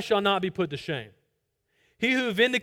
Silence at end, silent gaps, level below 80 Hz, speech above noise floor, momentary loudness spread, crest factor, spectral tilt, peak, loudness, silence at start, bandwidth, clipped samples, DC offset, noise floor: 0 s; none; -64 dBFS; 50 dB; 10 LU; 18 dB; -4.5 dB/octave; -8 dBFS; -26 LUFS; 0 s; 17 kHz; under 0.1%; under 0.1%; -76 dBFS